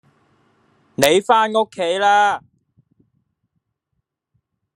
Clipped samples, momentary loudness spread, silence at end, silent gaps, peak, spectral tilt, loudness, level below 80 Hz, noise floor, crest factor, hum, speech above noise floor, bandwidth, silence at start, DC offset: under 0.1%; 9 LU; 2.35 s; none; 0 dBFS; -3 dB/octave; -16 LUFS; -64 dBFS; -75 dBFS; 20 dB; none; 60 dB; 13 kHz; 1 s; under 0.1%